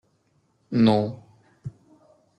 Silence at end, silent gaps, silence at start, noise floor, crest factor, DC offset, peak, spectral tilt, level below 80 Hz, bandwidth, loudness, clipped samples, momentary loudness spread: 0.7 s; none; 0.7 s; -67 dBFS; 20 dB; under 0.1%; -6 dBFS; -8.5 dB/octave; -60 dBFS; 8.6 kHz; -22 LUFS; under 0.1%; 22 LU